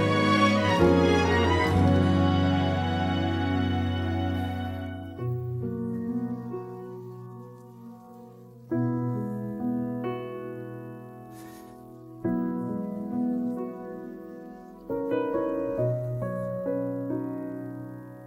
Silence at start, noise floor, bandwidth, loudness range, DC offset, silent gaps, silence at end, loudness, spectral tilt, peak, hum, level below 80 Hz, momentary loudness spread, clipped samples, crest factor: 0 s; -47 dBFS; 14 kHz; 11 LU; under 0.1%; none; 0 s; -27 LUFS; -7 dB/octave; -8 dBFS; none; -50 dBFS; 22 LU; under 0.1%; 20 dB